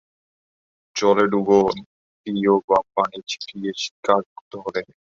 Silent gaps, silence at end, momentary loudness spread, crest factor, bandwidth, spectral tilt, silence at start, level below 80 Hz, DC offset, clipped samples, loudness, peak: 1.86-2.24 s, 2.64-2.68 s, 3.91-4.03 s, 4.26-4.51 s; 0.3 s; 14 LU; 20 dB; 7.6 kHz; -5 dB/octave; 0.95 s; -60 dBFS; under 0.1%; under 0.1%; -21 LUFS; -2 dBFS